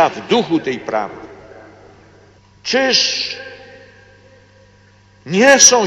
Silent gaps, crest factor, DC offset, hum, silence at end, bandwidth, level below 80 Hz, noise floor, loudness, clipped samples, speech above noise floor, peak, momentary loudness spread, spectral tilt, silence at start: none; 18 dB; under 0.1%; 50 Hz at -60 dBFS; 0 s; 13 kHz; -58 dBFS; -48 dBFS; -14 LUFS; under 0.1%; 34 dB; 0 dBFS; 21 LU; -1.5 dB/octave; 0 s